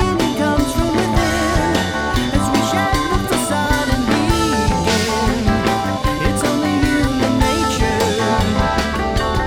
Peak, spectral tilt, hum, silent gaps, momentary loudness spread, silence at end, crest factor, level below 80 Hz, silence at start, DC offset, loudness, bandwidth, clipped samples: 0 dBFS; -5 dB/octave; none; none; 2 LU; 0 s; 16 dB; -26 dBFS; 0 s; under 0.1%; -17 LUFS; 19.5 kHz; under 0.1%